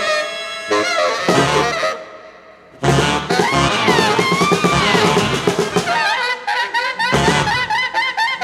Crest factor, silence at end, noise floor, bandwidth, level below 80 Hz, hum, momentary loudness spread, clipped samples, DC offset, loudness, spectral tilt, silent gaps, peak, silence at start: 16 dB; 0 s; -42 dBFS; 16 kHz; -40 dBFS; none; 6 LU; under 0.1%; under 0.1%; -16 LUFS; -4 dB/octave; none; 0 dBFS; 0 s